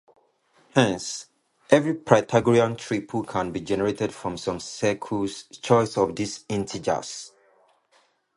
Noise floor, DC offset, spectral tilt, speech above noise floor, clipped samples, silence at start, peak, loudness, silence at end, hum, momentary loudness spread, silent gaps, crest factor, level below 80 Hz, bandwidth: -64 dBFS; under 0.1%; -5 dB/octave; 40 dB; under 0.1%; 0.75 s; -2 dBFS; -24 LUFS; 1.1 s; none; 11 LU; none; 24 dB; -56 dBFS; 11.5 kHz